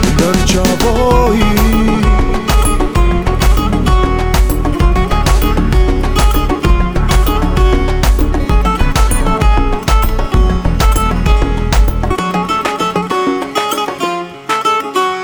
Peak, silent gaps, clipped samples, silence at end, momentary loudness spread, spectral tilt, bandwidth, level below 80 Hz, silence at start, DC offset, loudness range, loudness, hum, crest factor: 0 dBFS; none; under 0.1%; 0 s; 4 LU; -5.5 dB/octave; over 20 kHz; -12 dBFS; 0 s; under 0.1%; 2 LU; -13 LUFS; none; 10 dB